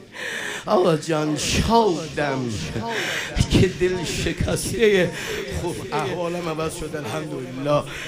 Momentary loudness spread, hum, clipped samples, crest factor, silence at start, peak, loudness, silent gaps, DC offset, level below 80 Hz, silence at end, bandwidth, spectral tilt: 10 LU; none; under 0.1%; 18 dB; 0 s; -4 dBFS; -23 LUFS; none; under 0.1%; -38 dBFS; 0 s; 15.5 kHz; -5 dB/octave